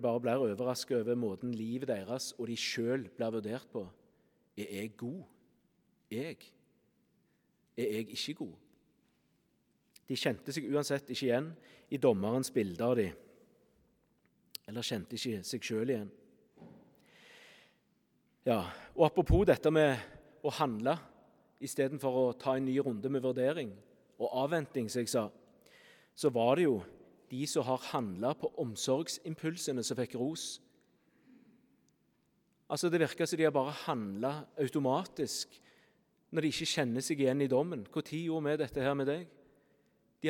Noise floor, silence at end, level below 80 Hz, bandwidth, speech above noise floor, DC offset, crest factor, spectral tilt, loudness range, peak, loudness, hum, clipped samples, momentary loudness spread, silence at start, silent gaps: -75 dBFS; 0 s; -54 dBFS; 18.5 kHz; 41 dB; under 0.1%; 24 dB; -5 dB/octave; 10 LU; -12 dBFS; -34 LUFS; none; under 0.1%; 13 LU; 0 s; none